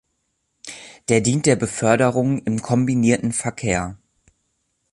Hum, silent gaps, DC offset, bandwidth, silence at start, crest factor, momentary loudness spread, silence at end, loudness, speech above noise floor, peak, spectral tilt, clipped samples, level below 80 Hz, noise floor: none; none; under 0.1%; 11.5 kHz; 0.65 s; 18 dB; 17 LU; 1 s; -19 LUFS; 53 dB; -2 dBFS; -5.5 dB/octave; under 0.1%; -48 dBFS; -72 dBFS